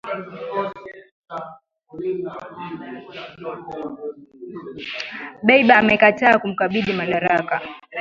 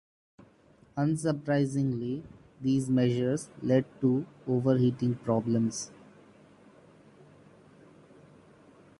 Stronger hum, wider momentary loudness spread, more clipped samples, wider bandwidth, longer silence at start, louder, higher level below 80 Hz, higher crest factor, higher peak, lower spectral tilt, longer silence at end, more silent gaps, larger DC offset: neither; first, 22 LU vs 9 LU; neither; second, 7.4 kHz vs 11.5 kHz; second, 0.05 s vs 0.95 s; first, -18 LUFS vs -29 LUFS; first, -60 dBFS vs -66 dBFS; about the same, 22 dB vs 18 dB; first, 0 dBFS vs -12 dBFS; about the same, -6.5 dB/octave vs -7 dB/octave; second, 0 s vs 3.1 s; first, 1.12-1.22 s vs none; neither